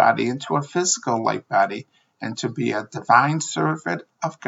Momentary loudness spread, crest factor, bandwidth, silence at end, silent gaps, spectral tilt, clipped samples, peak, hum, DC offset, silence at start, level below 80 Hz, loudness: 12 LU; 22 dB; 8 kHz; 0 s; none; -4 dB/octave; under 0.1%; 0 dBFS; none; under 0.1%; 0 s; -74 dBFS; -22 LUFS